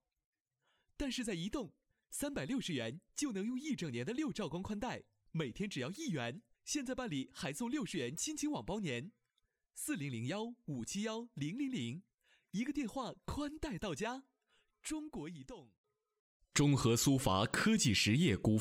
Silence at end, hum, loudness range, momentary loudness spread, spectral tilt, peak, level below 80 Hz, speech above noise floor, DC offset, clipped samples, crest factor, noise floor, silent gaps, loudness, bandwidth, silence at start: 0 s; none; 8 LU; 14 LU; -4.5 dB/octave; -20 dBFS; -60 dBFS; 46 dB; under 0.1%; under 0.1%; 20 dB; -84 dBFS; 15.78-15.84 s, 16.19-16.40 s; -38 LUFS; 16 kHz; 1 s